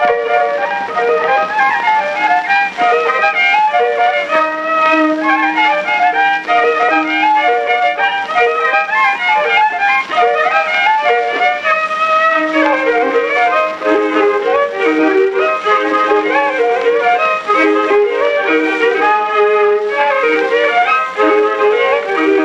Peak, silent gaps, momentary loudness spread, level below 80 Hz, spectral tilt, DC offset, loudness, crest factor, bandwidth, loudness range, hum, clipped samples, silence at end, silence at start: 0 dBFS; none; 2 LU; -60 dBFS; -3.5 dB/octave; under 0.1%; -12 LUFS; 12 dB; 9.6 kHz; 1 LU; none; under 0.1%; 0 s; 0 s